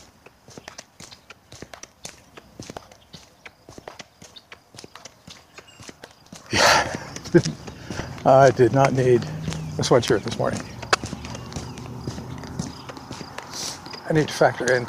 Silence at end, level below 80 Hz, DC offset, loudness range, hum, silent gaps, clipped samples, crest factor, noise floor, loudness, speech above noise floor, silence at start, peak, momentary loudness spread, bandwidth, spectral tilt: 0 s; -50 dBFS; under 0.1%; 23 LU; none; none; under 0.1%; 22 dB; -50 dBFS; -21 LUFS; 32 dB; 0.5 s; -2 dBFS; 26 LU; 15.5 kHz; -4.5 dB/octave